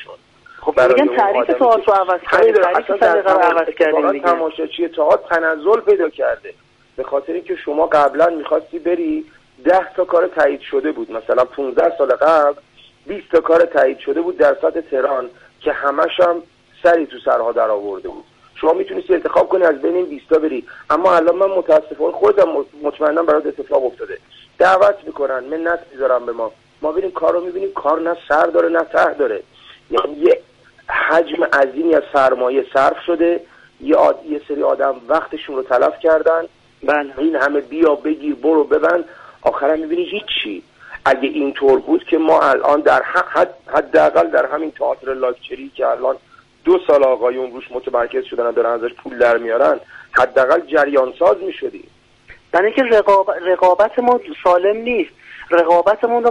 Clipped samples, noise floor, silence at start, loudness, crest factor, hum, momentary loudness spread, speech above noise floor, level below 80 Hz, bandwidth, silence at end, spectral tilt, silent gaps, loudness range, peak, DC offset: under 0.1%; -45 dBFS; 0 s; -16 LUFS; 14 dB; none; 10 LU; 30 dB; -54 dBFS; 9.4 kHz; 0 s; -5 dB/octave; none; 3 LU; -2 dBFS; under 0.1%